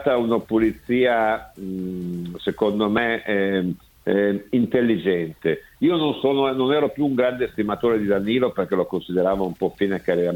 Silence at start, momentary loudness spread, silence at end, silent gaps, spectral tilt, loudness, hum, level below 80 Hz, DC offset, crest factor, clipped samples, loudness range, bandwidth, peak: 0 s; 8 LU; 0 s; none; -7.5 dB/octave; -22 LUFS; none; -52 dBFS; under 0.1%; 16 dB; under 0.1%; 2 LU; 18.5 kHz; -4 dBFS